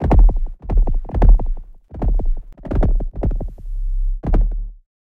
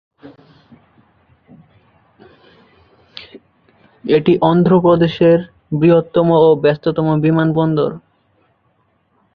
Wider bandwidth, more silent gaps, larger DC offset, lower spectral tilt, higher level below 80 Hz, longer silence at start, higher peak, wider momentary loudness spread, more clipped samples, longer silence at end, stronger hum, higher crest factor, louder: second, 2.7 kHz vs 5.2 kHz; neither; neither; about the same, -10.5 dB/octave vs -10 dB/octave; first, -16 dBFS vs -52 dBFS; second, 0 s vs 0.25 s; about the same, -2 dBFS vs -2 dBFS; about the same, 15 LU vs 16 LU; neither; second, 0.35 s vs 1.35 s; neither; about the same, 14 dB vs 16 dB; second, -22 LUFS vs -14 LUFS